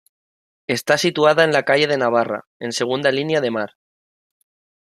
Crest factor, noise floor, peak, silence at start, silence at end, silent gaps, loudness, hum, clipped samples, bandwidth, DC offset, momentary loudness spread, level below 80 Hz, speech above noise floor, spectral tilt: 18 dB; under -90 dBFS; -2 dBFS; 0.7 s; 1.2 s; 2.47-2.60 s; -18 LUFS; none; under 0.1%; 15 kHz; under 0.1%; 11 LU; -66 dBFS; over 72 dB; -4 dB/octave